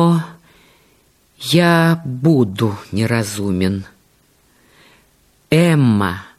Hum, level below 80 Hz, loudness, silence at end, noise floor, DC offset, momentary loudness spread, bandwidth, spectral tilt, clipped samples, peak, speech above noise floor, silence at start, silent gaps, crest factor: none; -52 dBFS; -16 LUFS; 0.15 s; -56 dBFS; under 0.1%; 8 LU; 15 kHz; -6.5 dB/octave; under 0.1%; -2 dBFS; 41 dB; 0 s; none; 16 dB